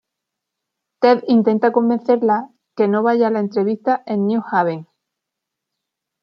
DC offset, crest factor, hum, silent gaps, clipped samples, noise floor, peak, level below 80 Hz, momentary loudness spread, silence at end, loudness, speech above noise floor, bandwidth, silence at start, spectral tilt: under 0.1%; 16 dB; none; none; under 0.1%; -82 dBFS; -2 dBFS; -70 dBFS; 6 LU; 1.4 s; -17 LUFS; 65 dB; 6 kHz; 1 s; -8.5 dB/octave